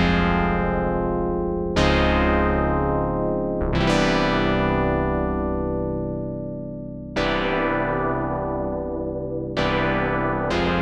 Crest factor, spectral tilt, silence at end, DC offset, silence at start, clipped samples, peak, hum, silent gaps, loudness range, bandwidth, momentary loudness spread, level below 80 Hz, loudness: 14 dB; -6.5 dB/octave; 0 s; under 0.1%; 0 s; under 0.1%; -8 dBFS; none; none; 4 LU; 10.5 kHz; 9 LU; -32 dBFS; -23 LUFS